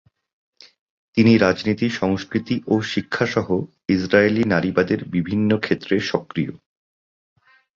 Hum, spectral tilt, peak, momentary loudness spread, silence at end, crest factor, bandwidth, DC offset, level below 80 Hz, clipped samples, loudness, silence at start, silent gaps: none; -6.5 dB/octave; -2 dBFS; 8 LU; 1.2 s; 20 dB; 7.4 kHz; under 0.1%; -50 dBFS; under 0.1%; -20 LUFS; 1.15 s; none